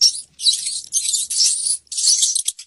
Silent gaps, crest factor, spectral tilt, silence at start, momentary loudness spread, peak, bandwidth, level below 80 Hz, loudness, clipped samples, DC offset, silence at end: none; 16 dB; 5.5 dB/octave; 0 s; 6 LU; -2 dBFS; 15.5 kHz; -66 dBFS; -16 LUFS; under 0.1%; under 0.1%; 0.05 s